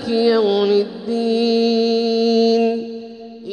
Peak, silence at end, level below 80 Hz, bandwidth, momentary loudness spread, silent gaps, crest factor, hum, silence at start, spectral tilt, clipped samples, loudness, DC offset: -4 dBFS; 0 s; -62 dBFS; 9.4 kHz; 15 LU; none; 12 dB; none; 0 s; -5.5 dB/octave; under 0.1%; -17 LUFS; under 0.1%